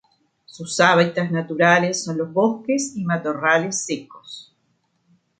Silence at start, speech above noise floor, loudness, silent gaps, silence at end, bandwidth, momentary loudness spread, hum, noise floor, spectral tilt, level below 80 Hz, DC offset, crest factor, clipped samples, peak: 0.5 s; 47 dB; -20 LUFS; none; 1 s; 9.6 kHz; 21 LU; none; -68 dBFS; -4 dB/octave; -68 dBFS; under 0.1%; 20 dB; under 0.1%; -2 dBFS